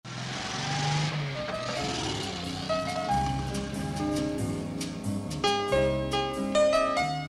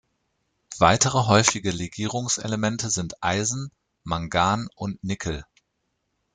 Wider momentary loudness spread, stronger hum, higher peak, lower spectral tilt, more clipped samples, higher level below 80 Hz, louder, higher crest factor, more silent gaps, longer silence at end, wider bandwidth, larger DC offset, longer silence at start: second, 8 LU vs 14 LU; neither; second, -12 dBFS vs 0 dBFS; about the same, -4.5 dB/octave vs -3.5 dB/octave; neither; about the same, -46 dBFS vs -50 dBFS; second, -29 LUFS vs -23 LUFS; second, 18 dB vs 26 dB; neither; second, 0 s vs 0.9 s; first, 13.5 kHz vs 9.8 kHz; neither; second, 0.05 s vs 0.7 s